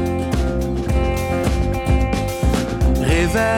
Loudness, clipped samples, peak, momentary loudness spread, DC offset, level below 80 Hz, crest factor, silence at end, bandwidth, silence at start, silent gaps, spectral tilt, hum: -19 LUFS; under 0.1%; -6 dBFS; 4 LU; under 0.1%; -22 dBFS; 12 dB; 0 s; 16.5 kHz; 0 s; none; -6 dB/octave; none